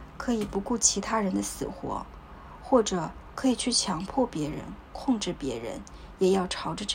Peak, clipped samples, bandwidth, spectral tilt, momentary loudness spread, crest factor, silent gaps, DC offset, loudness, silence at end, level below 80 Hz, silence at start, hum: -6 dBFS; under 0.1%; 16 kHz; -3.5 dB/octave; 17 LU; 24 dB; none; under 0.1%; -28 LUFS; 0 s; -48 dBFS; 0 s; none